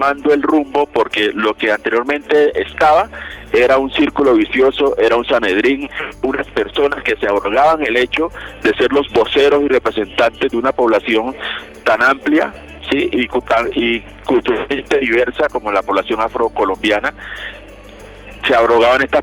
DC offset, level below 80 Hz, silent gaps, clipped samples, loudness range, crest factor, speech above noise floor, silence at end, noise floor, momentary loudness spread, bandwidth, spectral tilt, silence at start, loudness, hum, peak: under 0.1%; -40 dBFS; none; under 0.1%; 3 LU; 10 dB; 21 dB; 0 s; -36 dBFS; 8 LU; 13 kHz; -5 dB/octave; 0 s; -15 LUFS; none; -4 dBFS